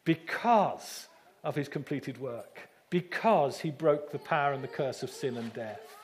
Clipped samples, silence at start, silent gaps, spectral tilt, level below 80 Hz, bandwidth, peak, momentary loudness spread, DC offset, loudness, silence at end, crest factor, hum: under 0.1%; 0.05 s; none; -6 dB/octave; -82 dBFS; 15.5 kHz; -12 dBFS; 15 LU; under 0.1%; -31 LUFS; 0 s; 20 dB; none